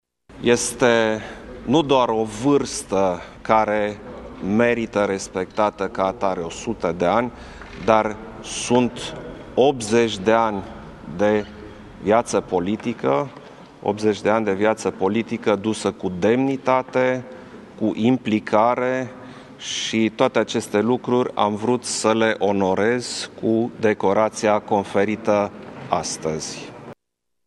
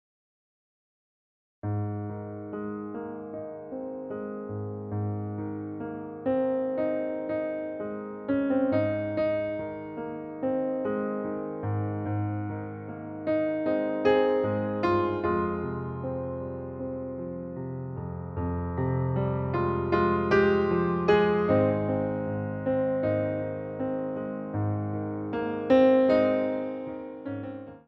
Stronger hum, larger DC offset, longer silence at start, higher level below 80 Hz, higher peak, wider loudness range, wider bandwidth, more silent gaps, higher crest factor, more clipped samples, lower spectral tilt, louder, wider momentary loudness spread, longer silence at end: neither; neither; second, 0.3 s vs 1.65 s; about the same, -50 dBFS vs -54 dBFS; first, 0 dBFS vs -8 dBFS; second, 2 LU vs 10 LU; first, 12.5 kHz vs 6.2 kHz; neither; about the same, 20 dB vs 20 dB; neither; second, -4.5 dB/octave vs -9.5 dB/octave; first, -21 LUFS vs -29 LUFS; about the same, 13 LU vs 13 LU; first, 0.55 s vs 0.05 s